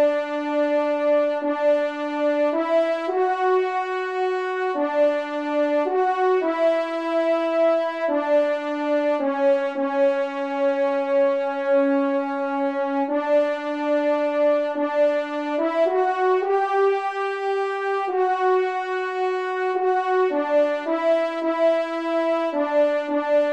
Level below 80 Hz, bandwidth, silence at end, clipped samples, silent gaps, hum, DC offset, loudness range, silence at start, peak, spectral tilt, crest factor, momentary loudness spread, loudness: -76 dBFS; 8.4 kHz; 0 s; under 0.1%; none; none; 0.1%; 1 LU; 0 s; -10 dBFS; -3.5 dB/octave; 12 dB; 4 LU; -22 LUFS